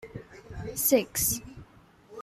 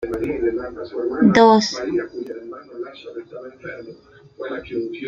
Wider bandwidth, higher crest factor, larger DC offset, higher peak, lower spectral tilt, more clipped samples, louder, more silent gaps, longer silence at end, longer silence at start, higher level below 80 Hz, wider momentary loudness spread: first, 16 kHz vs 7.8 kHz; about the same, 22 dB vs 22 dB; neither; second, -10 dBFS vs 0 dBFS; second, -3.5 dB/octave vs -5.5 dB/octave; neither; second, -26 LUFS vs -19 LUFS; neither; about the same, 0 s vs 0 s; about the same, 0 s vs 0 s; about the same, -52 dBFS vs -50 dBFS; about the same, 23 LU vs 22 LU